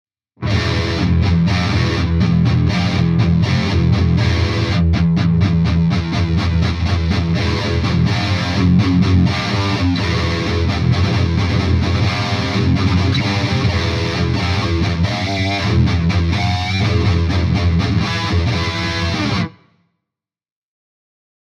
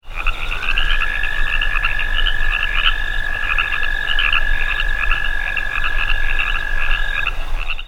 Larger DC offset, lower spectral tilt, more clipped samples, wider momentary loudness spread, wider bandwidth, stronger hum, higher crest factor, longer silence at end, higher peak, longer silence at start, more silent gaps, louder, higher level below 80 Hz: neither; first, -6.5 dB/octave vs -2.5 dB/octave; neither; about the same, 3 LU vs 5 LU; first, 9.4 kHz vs 7.4 kHz; neither; about the same, 14 dB vs 16 dB; first, 2 s vs 0 s; about the same, -2 dBFS vs 0 dBFS; first, 0.4 s vs 0.05 s; neither; first, -16 LUFS vs -19 LUFS; second, -32 dBFS vs -20 dBFS